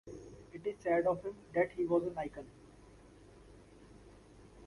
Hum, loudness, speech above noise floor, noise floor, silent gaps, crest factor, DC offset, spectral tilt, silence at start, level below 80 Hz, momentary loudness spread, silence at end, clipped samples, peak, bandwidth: none; -36 LUFS; 24 dB; -58 dBFS; none; 20 dB; under 0.1%; -7.5 dB/octave; 0.05 s; -64 dBFS; 21 LU; 0 s; under 0.1%; -20 dBFS; 11.5 kHz